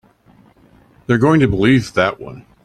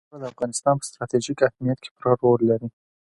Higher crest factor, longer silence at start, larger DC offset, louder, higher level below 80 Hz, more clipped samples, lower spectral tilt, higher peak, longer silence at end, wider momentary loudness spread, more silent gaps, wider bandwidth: about the same, 16 dB vs 20 dB; first, 1.1 s vs 0.15 s; neither; first, -15 LUFS vs -23 LUFS; first, -42 dBFS vs -60 dBFS; neither; about the same, -7 dB/octave vs -6 dB/octave; about the same, -2 dBFS vs -2 dBFS; second, 0.25 s vs 0.4 s; first, 21 LU vs 10 LU; second, none vs 1.91-1.96 s; about the same, 12 kHz vs 11.5 kHz